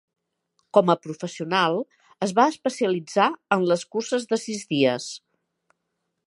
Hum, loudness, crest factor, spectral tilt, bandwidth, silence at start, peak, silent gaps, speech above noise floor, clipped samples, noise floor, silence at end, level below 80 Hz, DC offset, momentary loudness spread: none; -23 LUFS; 22 dB; -4.5 dB/octave; 11.5 kHz; 0.75 s; -2 dBFS; none; 56 dB; under 0.1%; -78 dBFS; 1.1 s; -78 dBFS; under 0.1%; 10 LU